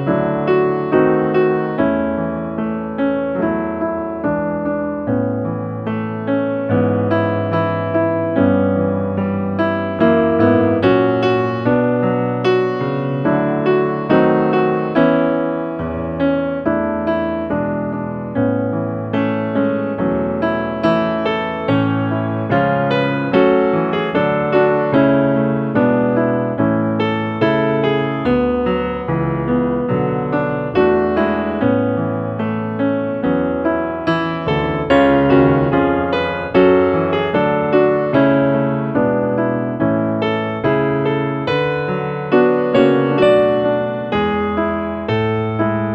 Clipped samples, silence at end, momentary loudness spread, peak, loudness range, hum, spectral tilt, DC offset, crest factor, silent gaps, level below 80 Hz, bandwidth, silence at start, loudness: under 0.1%; 0 s; 6 LU; -2 dBFS; 4 LU; none; -9 dB/octave; under 0.1%; 14 dB; none; -44 dBFS; 6 kHz; 0 s; -17 LUFS